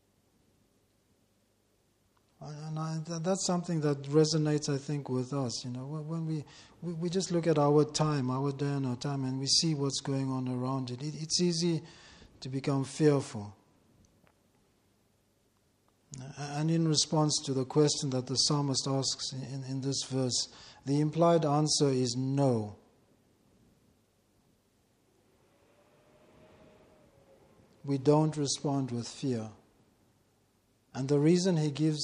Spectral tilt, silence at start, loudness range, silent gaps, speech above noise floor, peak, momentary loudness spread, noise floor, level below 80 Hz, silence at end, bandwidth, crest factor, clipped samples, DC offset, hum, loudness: -5 dB/octave; 2.4 s; 7 LU; none; 41 dB; -12 dBFS; 14 LU; -72 dBFS; -70 dBFS; 0 s; 11 kHz; 20 dB; under 0.1%; under 0.1%; none; -30 LUFS